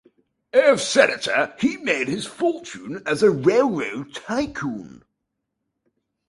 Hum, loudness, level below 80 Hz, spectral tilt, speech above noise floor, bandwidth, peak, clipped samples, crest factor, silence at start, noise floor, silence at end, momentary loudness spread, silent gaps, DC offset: none; -21 LUFS; -58 dBFS; -4 dB/octave; 58 dB; 11.5 kHz; -2 dBFS; under 0.1%; 20 dB; 0.55 s; -79 dBFS; 1.3 s; 14 LU; none; under 0.1%